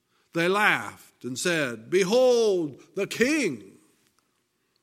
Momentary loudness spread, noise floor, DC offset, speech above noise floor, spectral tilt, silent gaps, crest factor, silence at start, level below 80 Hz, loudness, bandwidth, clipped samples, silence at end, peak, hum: 14 LU; -73 dBFS; under 0.1%; 48 dB; -4 dB/octave; none; 20 dB; 0.35 s; -70 dBFS; -24 LUFS; 16 kHz; under 0.1%; 1.15 s; -6 dBFS; none